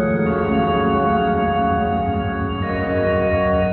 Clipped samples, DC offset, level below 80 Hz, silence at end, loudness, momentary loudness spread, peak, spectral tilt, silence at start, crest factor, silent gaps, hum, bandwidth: under 0.1%; under 0.1%; -34 dBFS; 0 s; -19 LUFS; 5 LU; -6 dBFS; -10.5 dB/octave; 0 s; 12 dB; none; none; 4.5 kHz